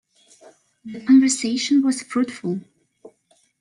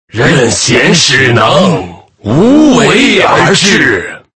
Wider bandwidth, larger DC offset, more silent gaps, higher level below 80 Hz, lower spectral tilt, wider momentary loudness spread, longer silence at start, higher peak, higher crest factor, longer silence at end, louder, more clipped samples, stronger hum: about the same, 11 kHz vs 11 kHz; neither; neither; second, -70 dBFS vs -38 dBFS; about the same, -3.5 dB/octave vs -4 dB/octave; first, 16 LU vs 8 LU; first, 0.85 s vs 0.15 s; second, -6 dBFS vs 0 dBFS; first, 16 dB vs 8 dB; first, 1 s vs 0.2 s; second, -20 LUFS vs -6 LUFS; second, under 0.1% vs 2%; neither